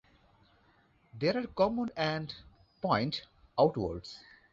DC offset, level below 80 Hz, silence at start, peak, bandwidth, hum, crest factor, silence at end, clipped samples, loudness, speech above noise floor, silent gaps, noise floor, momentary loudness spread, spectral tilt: under 0.1%; -60 dBFS; 1.15 s; -12 dBFS; 7.6 kHz; none; 22 dB; 0.35 s; under 0.1%; -32 LUFS; 35 dB; none; -67 dBFS; 15 LU; -4.5 dB/octave